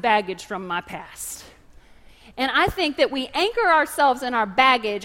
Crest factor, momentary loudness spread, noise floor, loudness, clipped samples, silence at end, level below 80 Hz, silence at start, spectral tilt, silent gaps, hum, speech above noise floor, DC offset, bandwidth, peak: 20 dB; 15 LU; -49 dBFS; -21 LUFS; under 0.1%; 0 s; -50 dBFS; 0.05 s; -3 dB/octave; none; none; 27 dB; under 0.1%; 16 kHz; -2 dBFS